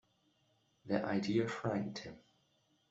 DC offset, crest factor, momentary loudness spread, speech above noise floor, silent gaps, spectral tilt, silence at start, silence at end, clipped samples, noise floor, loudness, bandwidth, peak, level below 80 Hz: under 0.1%; 20 dB; 12 LU; 39 dB; none; -6.5 dB/octave; 0.85 s; 0.7 s; under 0.1%; -76 dBFS; -37 LUFS; 8 kHz; -20 dBFS; -74 dBFS